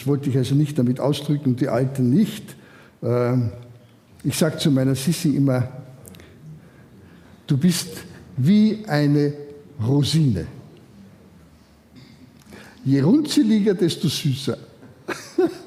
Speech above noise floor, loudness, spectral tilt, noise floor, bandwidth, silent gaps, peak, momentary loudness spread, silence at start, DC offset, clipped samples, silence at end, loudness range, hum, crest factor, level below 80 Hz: 32 dB; -21 LUFS; -6.5 dB/octave; -51 dBFS; 16 kHz; none; -4 dBFS; 16 LU; 0 s; under 0.1%; under 0.1%; 0 s; 4 LU; none; 16 dB; -56 dBFS